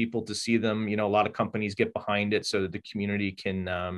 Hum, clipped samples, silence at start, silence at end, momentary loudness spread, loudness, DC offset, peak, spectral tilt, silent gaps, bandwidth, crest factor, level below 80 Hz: none; under 0.1%; 0 s; 0 s; 5 LU; -28 LUFS; under 0.1%; -10 dBFS; -5 dB/octave; none; 12 kHz; 18 dB; -54 dBFS